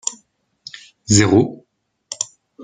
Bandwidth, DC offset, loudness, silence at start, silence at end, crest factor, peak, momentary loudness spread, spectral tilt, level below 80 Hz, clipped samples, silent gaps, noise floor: 9.6 kHz; under 0.1%; -17 LUFS; 0.05 s; 0 s; 20 dB; -2 dBFS; 24 LU; -4.5 dB/octave; -52 dBFS; under 0.1%; none; -65 dBFS